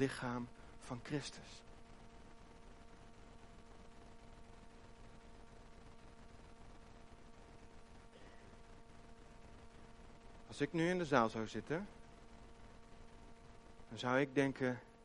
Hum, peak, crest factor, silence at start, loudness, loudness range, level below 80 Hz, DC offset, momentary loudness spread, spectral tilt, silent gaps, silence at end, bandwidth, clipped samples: none; -16 dBFS; 28 dB; 0 s; -40 LUFS; 20 LU; -62 dBFS; under 0.1%; 24 LU; -5.5 dB/octave; none; 0 s; 11.5 kHz; under 0.1%